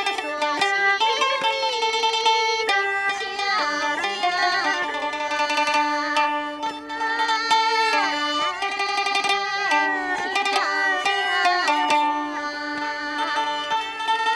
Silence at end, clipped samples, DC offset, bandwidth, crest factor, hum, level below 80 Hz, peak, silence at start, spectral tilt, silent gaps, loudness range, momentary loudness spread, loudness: 0 s; under 0.1%; under 0.1%; 13 kHz; 16 dB; none; -64 dBFS; -6 dBFS; 0 s; -0.5 dB/octave; none; 2 LU; 6 LU; -21 LUFS